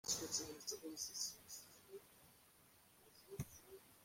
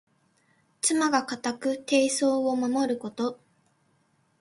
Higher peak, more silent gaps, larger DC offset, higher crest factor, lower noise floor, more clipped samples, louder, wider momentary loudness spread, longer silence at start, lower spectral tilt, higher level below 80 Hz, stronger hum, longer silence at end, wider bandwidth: second, -28 dBFS vs -8 dBFS; neither; neither; about the same, 22 dB vs 20 dB; about the same, -70 dBFS vs -68 dBFS; neither; second, -47 LUFS vs -26 LUFS; first, 24 LU vs 9 LU; second, 0.05 s vs 0.85 s; about the same, -2 dB/octave vs -2.5 dB/octave; about the same, -74 dBFS vs -74 dBFS; neither; second, 0 s vs 1.05 s; first, 16.5 kHz vs 11.5 kHz